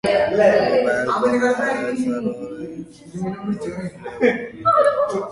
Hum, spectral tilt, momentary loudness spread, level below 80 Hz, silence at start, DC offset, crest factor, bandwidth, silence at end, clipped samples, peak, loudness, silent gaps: none; -5.5 dB/octave; 16 LU; -54 dBFS; 0.05 s; under 0.1%; 16 dB; 11.5 kHz; 0 s; under 0.1%; -2 dBFS; -19 LUFS; none